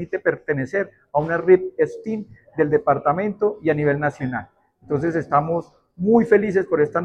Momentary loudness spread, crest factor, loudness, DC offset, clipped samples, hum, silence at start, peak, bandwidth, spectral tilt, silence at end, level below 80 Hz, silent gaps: 11 LU; 18 dB; -21 LUFS; under 0.1%; under 0.1%; none; 0 s; -2 dBFS; 8.2 kHz; -9 dB/octave; 0 s; -56 dBFS; none